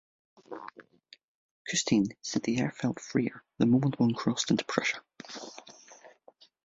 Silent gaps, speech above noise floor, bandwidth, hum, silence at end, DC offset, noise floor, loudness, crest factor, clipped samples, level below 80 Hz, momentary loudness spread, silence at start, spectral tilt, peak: 1.24-1.65 s; 31 dB; 8 kHz; none; 0.6 s; under 0.1%; -60 dBFS; -29 LUFS; 24 dB; under 0.1%; -66 dBFS; 20 LU; 0.5 s; -4.5 dB/octave; -8 dBFS